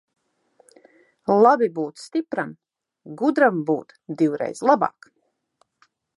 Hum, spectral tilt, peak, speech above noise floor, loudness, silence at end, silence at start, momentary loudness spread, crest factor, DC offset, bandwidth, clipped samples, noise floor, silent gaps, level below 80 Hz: none; -6.5 dB/octave; -2 dBFS; 47 dB; -21 LUFS; 1.3 s; 1.3 s; 15 LU; 20 dB; under 0.1%; 11.5 kHz; under 0.1%; -68 dBFS; none; -76 dBFS